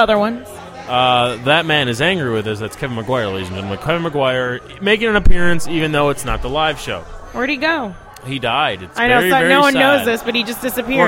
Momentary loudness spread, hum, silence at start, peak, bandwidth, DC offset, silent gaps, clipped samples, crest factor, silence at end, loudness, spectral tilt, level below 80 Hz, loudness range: 12 LU; none; 0 s; 0 dBFS; 16.5 kHz; under 0.1%; none; under 0.1%; 16 dB; 0 s; -16 LUFS; -4.5 dB/octave; -26 dBFS; 4 LU